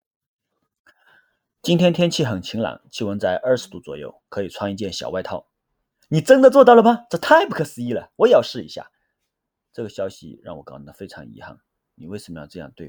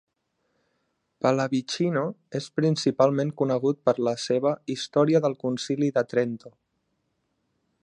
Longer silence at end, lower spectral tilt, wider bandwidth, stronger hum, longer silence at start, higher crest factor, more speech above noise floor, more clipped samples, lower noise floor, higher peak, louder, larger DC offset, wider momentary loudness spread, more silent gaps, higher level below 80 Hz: second, 0 s vs 1.35 s; about the same, -5.5 dB/octave vs -6 dB/octave; first, over 20 kHz vs 10.5 kHz; neither; first, 1.65 s vs 1.25 s; about the same, 20 dB vs 20 dB; first, 60 dB vs 50 dB; neither; first, -79 dBFS vs -75 dBFS; first, 0 dBFS vs -6 dBFS; first, -18 LUFS vs -25 LUFS; neither; first, 25 LU vs 8 LU; neither; first, -60 dBFS vs -74 dBFS